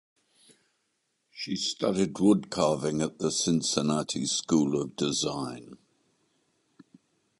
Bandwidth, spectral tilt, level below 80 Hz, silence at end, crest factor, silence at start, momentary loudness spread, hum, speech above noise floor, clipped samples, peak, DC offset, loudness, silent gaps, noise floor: 11.5 kHz; -4.5 dB/octave; -62 dBFS; 1.65 s; 22 dB; 1.35 s; 9 LU; none; 49 dB; under 0.1%; -8 dBFS; under 0.1%; -28 LUFS; none; -77 dBFS